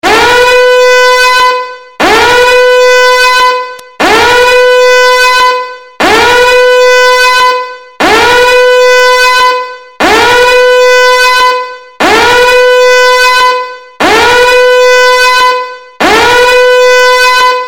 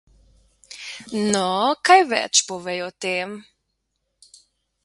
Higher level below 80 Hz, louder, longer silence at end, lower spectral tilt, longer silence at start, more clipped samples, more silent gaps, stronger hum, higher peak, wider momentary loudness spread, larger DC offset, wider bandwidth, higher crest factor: first, -34 dBFS vs -64 dBFS; first, -4 LUFS vs -20 LUFS; second, 0 s vs 1.45 s; about the same, -1.5 dB/octave vs -2 dB/octave; second, 0.05 s vs 0.7 s; first, 0.2% vs under 0.1%; neither; neither; about the same, 0 dBFS vs -2 dBFS; second, 7 LU vs 20 LU; neither; first, 17.5 kHz vs 11.5 kHz; second, 4 dB vs 22 dB